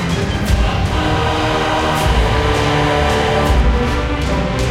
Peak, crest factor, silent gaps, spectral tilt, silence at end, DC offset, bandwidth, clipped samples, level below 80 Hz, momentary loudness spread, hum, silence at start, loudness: -2 dBFS; 12 dB; none; -5.5 dB/octave; 0 s; under 0.1%; 15.5 kHz; under 0.1%; -20 dBFS; 3 LU; none; 0 s; -16 LUFS